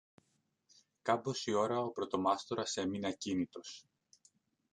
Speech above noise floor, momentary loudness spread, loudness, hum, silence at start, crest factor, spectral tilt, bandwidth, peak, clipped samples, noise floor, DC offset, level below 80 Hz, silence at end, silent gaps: 43 dB; 9 LU; -36 LUFS; none; 1.05 s; 22 dB; -4.5 dB/octave; 10.5 kHz; -16 dBFS; under 0.1%; -79 dBFS; under 0.1%; -72 dBFS; 0.95 s; none